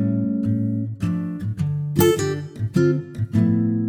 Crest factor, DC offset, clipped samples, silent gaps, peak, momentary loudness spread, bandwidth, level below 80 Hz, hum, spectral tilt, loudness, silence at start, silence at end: 18 dB; under 0.1%; under 0.1%; none; -4 dBFS; 7 LU; 17 kHz; -50 dBFS; none; -7 dB/octave; -22 LUFS; 0 s; 0 s